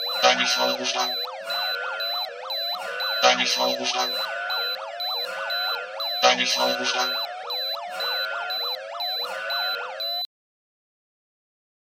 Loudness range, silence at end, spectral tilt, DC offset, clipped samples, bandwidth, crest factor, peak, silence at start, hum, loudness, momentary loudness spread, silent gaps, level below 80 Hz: 4 LU; 1.75 s; 0 dB/octave; under 0.1%; under 0.1%; 17 kHz; 24 dB; -2 dBFS; 0 s; none; -24 LUFS; 9 LU; none; -84 dBFS